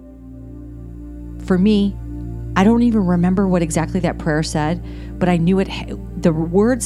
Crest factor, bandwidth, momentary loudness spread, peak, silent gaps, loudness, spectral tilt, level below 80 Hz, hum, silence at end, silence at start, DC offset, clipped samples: 18 dB; 12 kHz; 20 LU; 0 dBFS; none; -18 LUFS; -6.5 dB/octave; -32 dBFS; 60 Hz at -40 dBFS; 0 s; 0 s; under 0.1%; under 0.1%